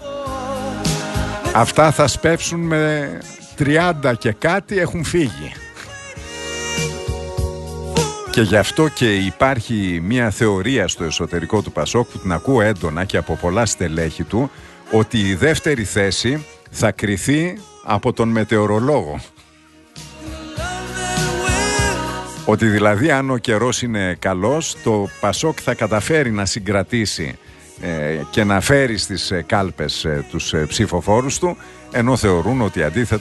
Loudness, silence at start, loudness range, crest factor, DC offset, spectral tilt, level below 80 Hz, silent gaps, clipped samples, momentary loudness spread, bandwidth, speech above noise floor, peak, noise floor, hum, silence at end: -18 LUFS; 0 s; 4 LU; 18 dB; under 0.1%; -4.5 dB/octave; -36 dBFS; none; under 0.1%; 11 LU; 12.5 kHz; 31 dB; 0 dBFS; -48 dBFS; none; 0 s